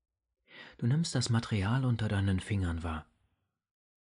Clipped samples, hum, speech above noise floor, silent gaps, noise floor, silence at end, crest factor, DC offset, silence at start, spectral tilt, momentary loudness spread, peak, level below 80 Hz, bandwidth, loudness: under 0.1%; none; 48 dB; none; -79 dBFS; 1.15 s; 14 dB; under 0.1%; 0.5 s; -6 dB/octave; 11 LU; -18 dBFS; -52 dBFS; 10.5 kHz; -32 LUFS